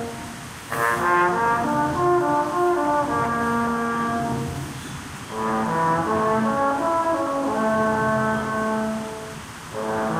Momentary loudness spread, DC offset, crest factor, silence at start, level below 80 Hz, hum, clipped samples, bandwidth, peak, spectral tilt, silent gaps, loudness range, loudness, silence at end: 13 LU; under 0.1%; 14 dB; 0 s; -50 dBFS; none; under 0.1%; 16 kHz; -8 dBFS; -5.5 dB/octave; none; 3 LU; -22 LUFS; 0 s